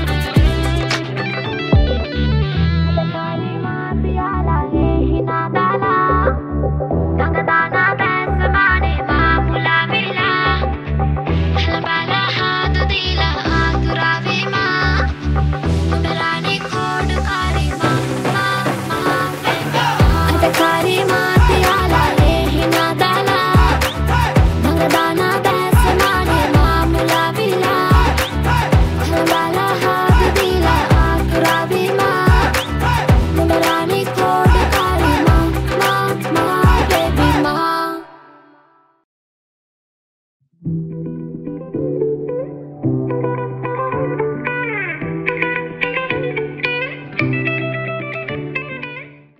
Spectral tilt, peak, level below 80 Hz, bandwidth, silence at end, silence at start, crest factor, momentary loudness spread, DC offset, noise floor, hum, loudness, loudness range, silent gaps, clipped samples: -5.5 dB/octave; -2 dBFS; -22 dBFS; 16 kHz; 0.25 s; 0 s; 14 dB; 8 LU; under 0.1%; -53 dBFS; none; -16 LUFS; 7 LU; 39.04-40.40 s; under 0.1%